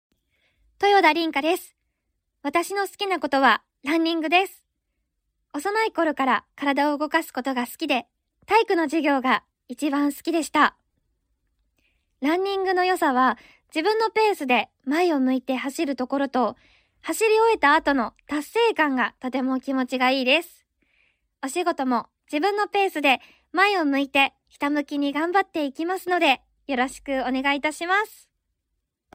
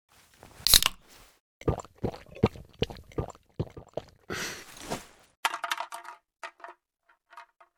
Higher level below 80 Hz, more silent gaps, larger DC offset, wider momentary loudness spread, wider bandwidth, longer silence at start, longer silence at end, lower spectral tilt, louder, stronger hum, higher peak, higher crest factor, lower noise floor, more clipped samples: second, -64 dBFS vs -46 dBFS; second, none vs 1.40-1.60 s, 5.37-5.43 s; neither; second, 8 LU vs 24 LU; second, 16 kHz vs over 20 kHz; first, 0.8 s vs 0.6 s; first, 1.1 s vs 0.35 s; about the same, -2.5 dB/octave vs -2.5 dB/octave; first, -23 LUFS vs -29 LUFS; neither; about the same, -4 dBFS vs -4 dBFS; second, 20 dB vs 30 dB; first, -79 dBFS vs -70 dBFS; neither